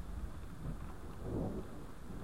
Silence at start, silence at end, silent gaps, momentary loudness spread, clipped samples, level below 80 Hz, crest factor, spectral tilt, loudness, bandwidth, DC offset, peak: 0 s; 0 s; none; 9 LU; under 0.1%; -48 dBFS; 16 dB; -7.5 dB/octave; -46 LUFS; 16 kHz; 0.4%; -28 dBFS